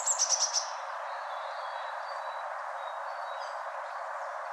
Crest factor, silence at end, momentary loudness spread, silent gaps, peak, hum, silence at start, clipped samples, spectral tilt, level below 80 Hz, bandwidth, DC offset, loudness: 20 dB; 0 s; 12 LU; none; -16 dBFS; none; 0 s; under 0.1%; 6 dB/octave; under -90 dBFS; 13 kHz; under 0.1%; -33 LUFS